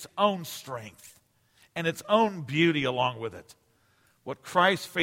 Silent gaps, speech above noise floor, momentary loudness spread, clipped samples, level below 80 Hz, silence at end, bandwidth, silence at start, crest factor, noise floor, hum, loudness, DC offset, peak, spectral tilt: none; 38 dB; 17 LU; under 0.1%; -68 dBFS; 0 s; 16.5 kHz; 0 s; 20 dB; -66 dBFS; none; -27 LUFS; under 0.1%; -8 dBFS; -5 dB/octave